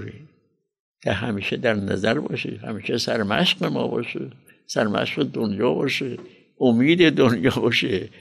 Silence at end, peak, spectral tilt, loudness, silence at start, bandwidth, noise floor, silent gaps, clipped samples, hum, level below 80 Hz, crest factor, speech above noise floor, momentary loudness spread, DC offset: 0.1 s; -6 dBFS; -5.5 dB/octave; -22 LUFS; 0 s; 13 kHz; -66 dBFS; 0.80-0.94 s; under 0.1%; none; -58 dBFS; 18 dB; 45 dB; 13 LU; under 0.1%